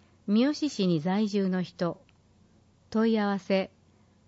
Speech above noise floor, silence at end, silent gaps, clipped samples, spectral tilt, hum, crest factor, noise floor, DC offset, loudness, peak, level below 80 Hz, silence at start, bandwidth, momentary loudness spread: 35 dB; 0.6 s; none; under 0.1%; -6.5 dB/octave; none; 16 dB; -62 dBFS; under 0.1%; -28 LUFS; -14 dBFS; -70 dBFS; 0.25 s; 8 kHz; 8 LU